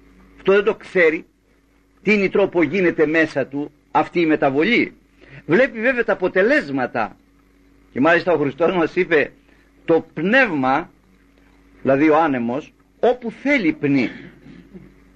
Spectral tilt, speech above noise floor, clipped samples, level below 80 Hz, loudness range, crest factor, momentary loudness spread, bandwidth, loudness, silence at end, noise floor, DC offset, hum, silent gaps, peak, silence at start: -7 dB/octave; 40 dB; under 0.1%; -52 dBFS; 2 LU; 16 dB; 10 LU; 8.6 kHz; -18 LUFS; 0.35 s; -57 dBFS; under 0.1%; none; none; -4 dBFS; 0.45 s